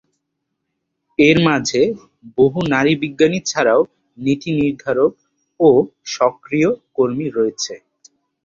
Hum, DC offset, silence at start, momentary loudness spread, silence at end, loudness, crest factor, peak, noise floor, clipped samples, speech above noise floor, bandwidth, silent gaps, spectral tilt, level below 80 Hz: none; under 0.1%; 1.2 s; 11 LU; 0.7 s; -17 LUFS; 16 dB; 0 dBFS; -75 dBFS; under 0.1%; 59 dB; 7.8 kHz; none; -5 dB/octave; -52 dBFS